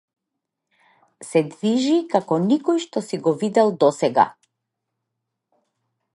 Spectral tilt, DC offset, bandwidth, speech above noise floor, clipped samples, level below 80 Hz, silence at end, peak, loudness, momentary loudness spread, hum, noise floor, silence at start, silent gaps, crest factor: -6 dB/octave; under 0.1%; 11.5 kHz; 62 dB; under 0.1%; -74 dBFS; 1.85 s; -2 dBFS; -20 LUFS; 5 LU; none; -82 dBFS; 1.2 s; none; 20 dB